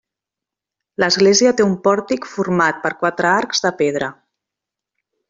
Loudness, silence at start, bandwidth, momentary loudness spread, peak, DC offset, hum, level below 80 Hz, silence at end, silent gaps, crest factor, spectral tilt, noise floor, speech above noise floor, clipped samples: -16 LUFS; 1 s; 7.8 kHz; 11 LU; -2 dBFS; under 0.1%; none; -58 dBFS; 1.2 s; none; 16 dB; -3.5 dB/octave; -86 dBFS; 70 dB; under 0.1%